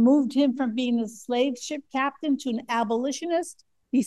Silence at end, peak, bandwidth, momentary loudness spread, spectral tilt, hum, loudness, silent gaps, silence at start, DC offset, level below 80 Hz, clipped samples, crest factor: 0 s; -10 dBFS; 12.5 kHz; 6 LU; -4.5 dB/octave; none; -26 LUFS; none; 0 s; under 0.1%; -76 dBFS; under 0.1%; 16 dB